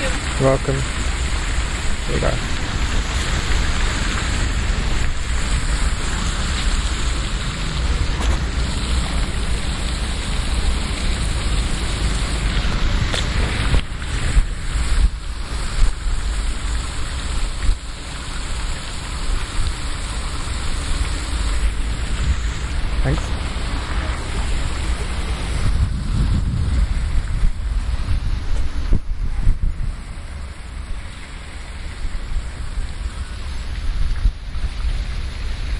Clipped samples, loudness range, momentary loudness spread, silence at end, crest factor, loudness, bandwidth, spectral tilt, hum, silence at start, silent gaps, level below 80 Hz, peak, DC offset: under 0.1%; 6 LU; 9 LU; 0 s; 16 dB; -24 LUFS; 11.5 kHz; -4.5 dB/octave; none; 0 s; none; -22 dBFS; -4 dBFS; under 0.1%